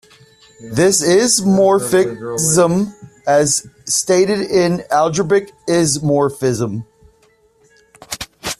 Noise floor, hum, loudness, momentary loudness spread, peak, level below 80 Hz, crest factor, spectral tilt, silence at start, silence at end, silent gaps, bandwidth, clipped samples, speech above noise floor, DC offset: -55 dBFS; none; -15 LUFS; 12 LU; -2 dBFS; -50 dBFS; 16 dB; -4 dB/octave; 0.6 s; 0.05 s; none; 14.5 kHz; under 0.1%; 40 dB; under 0.1%